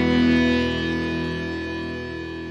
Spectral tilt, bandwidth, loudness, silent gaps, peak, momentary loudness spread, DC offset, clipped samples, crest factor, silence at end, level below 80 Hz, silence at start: -6.5 dB/octave; 8 kHz; -23 LUFS; none; -8 dBFS; 12 LU; under 0.1%; under 0.1%; 14 dB; 0 s; -40 dBFS; 0 s